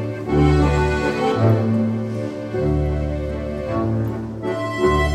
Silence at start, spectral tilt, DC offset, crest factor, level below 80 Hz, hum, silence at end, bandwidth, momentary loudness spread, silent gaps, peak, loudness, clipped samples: 0 s; -7.5 dB/octave; under 0.1%; 16 dB; -28 dBFS; none; 0 s; 12 kHz; 9 LU; none; -4 dBFS; -20 LUFS; under 0.1%